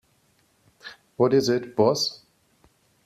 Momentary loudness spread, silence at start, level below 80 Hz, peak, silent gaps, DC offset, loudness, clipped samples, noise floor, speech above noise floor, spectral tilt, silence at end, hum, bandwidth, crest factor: 23 LU; 0.85 s; -66 dBFS; -8 dBFS; none; under 0.1%; -23 LUFS; under 0.1%; -65 dBFS; 43 dB; -5 dB/octave; 0.9 s; none; 14 kHz; 20 dB